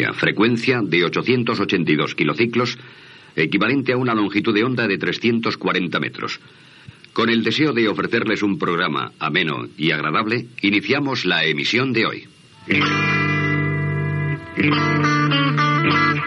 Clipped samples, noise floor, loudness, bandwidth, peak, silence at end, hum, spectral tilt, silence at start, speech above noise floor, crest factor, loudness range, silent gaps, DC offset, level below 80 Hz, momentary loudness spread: under 0.1%; -44 dBFS; -19 LUFS; 8.4 kHz; -4 dBFS; 0 s; none; -6 dB/octave; 0 s; 25 dB; 16 dB; 2 LU; none; under 0.1%; -64 dBFS; 6 LU